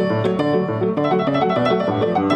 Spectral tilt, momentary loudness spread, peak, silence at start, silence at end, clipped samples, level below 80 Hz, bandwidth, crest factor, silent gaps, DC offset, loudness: -8 dB/octave; 2 LU; -6 dBFS; 0 s; 0 s; under 0.1%; -54 dBFS; 9 kHz; 12 dB; none; under 0.1%; -19 LUFS